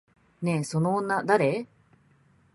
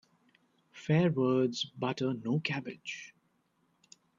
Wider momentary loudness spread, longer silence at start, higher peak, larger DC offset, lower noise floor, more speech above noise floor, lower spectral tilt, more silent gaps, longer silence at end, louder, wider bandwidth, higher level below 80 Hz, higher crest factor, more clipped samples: second, 10 LU vs 15 LU; second, 0.4 s vs 0.75 s; first, -8 dBFS vs -14 dBFS; neither; second, -62 dBFS vs -74 dBFS; second, 37 dB vs 43 dB; about the same, -6.5 dB/octave vs -6.5 dB/octave; neither; second, 0.9 s vs 1.1 s; first, -26 LUFS vs -32 LUFS; first, 11.5 kHz vs 7.6 kHz; first, -66 dBFS vs -74 dBFS; about the same, 20 dB vs 18 dB; neither